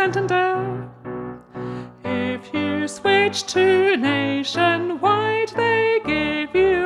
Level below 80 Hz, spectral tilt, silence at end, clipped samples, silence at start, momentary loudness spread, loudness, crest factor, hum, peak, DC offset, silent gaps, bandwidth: -52 dBFS; -4.5 dB/octave; 0 s; under 0.1%; 0 s; 15 LU; -20 LUFS; 14 dB; none; -6 dBFS; under 0.1%; none; 11.5 kHz